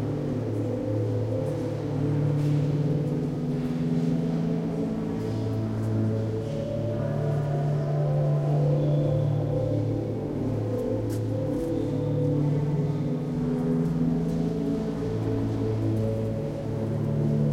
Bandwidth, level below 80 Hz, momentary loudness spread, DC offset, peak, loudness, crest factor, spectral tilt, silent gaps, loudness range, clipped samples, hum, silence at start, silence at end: 11 kHz; -46 dBFS; 5 LU; under 0.1%; -14 dBFS; -27 LUFS; 12 dB; -9.5 dB/octave; none; 2 LU; under 0.1%; none; 0 s; 0 s